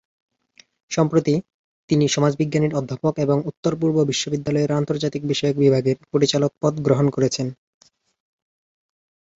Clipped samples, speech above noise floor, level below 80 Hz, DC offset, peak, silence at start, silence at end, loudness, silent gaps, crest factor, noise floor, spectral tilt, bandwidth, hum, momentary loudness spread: under 0.1%; 36 dB; -58 dBFS; under 0.1%; -4 dBFS; 0.9 s; 1.85 s; -21 LUFS; 1.54-1.88 s, 3.57-3.63 s; 18 dB; -56 dBFS; -6 dB/octave; 8 kHz; none; 6 LU